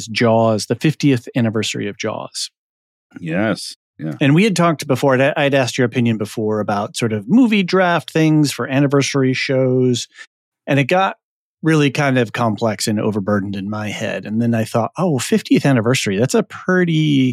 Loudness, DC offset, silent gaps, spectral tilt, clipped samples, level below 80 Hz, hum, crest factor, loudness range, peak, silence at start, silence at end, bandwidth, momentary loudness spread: -17 LUFS; under 0.1%; 2.57-3.10 s, 3.76-3.94 s, 10.27-10.52 s, 11.23-11.57 s; -5.5 dB/octave; under 0.1%; -70 dBFS; none; 12 dB; 4 LU; -4 dBFS; 0 s; 0 s; 15.5 kHz; 9 LU